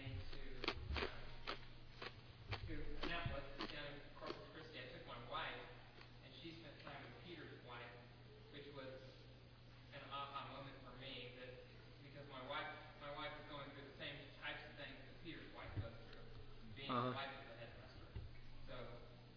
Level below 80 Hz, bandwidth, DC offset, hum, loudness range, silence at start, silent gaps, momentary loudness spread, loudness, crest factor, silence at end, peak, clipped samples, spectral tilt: -58 dBFS; 5.4 kHz; under 0.1%; none; 7 LU; 0 s; none; 13 LU; -52 LUFS; 28 dB; 0 s; -24 dBFS; under 0.1%; -3 dB/octave